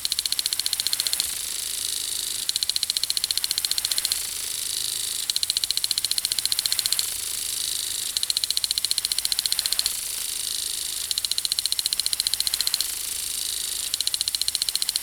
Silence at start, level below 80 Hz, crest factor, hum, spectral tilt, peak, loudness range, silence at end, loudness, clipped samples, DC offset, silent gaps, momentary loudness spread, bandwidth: 0 s; -56 dBFS; 24 dB; none; 2.5 dB/octave; -2 dBFS; 1 LU; 0 s; -23 LUFS; under 0.1%; under 0.1%; none; 4 LU; over 20 kHz